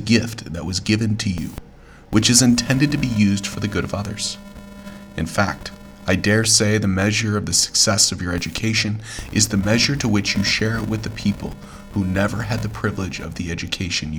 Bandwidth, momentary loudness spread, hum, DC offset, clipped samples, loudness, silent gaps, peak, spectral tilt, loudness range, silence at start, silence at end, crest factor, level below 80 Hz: over 20 kHz; 15 LU; none; under 0.1%; under 0.1%; -19 LUFS; none; 0 dBFS; -3.5 dB/octave; 6 LU; 0 s; 0 s; 20 dB; -40 dBFS